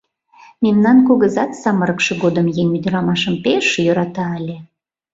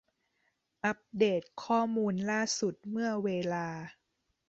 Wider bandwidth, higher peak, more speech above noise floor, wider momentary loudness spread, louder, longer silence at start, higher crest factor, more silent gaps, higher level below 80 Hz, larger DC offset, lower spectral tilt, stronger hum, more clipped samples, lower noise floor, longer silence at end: about the same, 7.8 kHz vs 8.2 kHz; first, -2 dBFS vs -16 dBFS; second, 32 dB vs 48 dB; first, 11 LU vs 7 LU; first, -16 LUFS vs -32 LUFS; second, 0.6 s vs 0.85 s; about the same, 14 dB vs 18 dB; neither; first, -54 dBFS vs -74 dBFS; neither; first, -6 dB/octave vs -4.5 dB/octave; neither; neither; second, -47 dBFS vs -80 dBFS; about the same, 0.5 s vs 0.6 s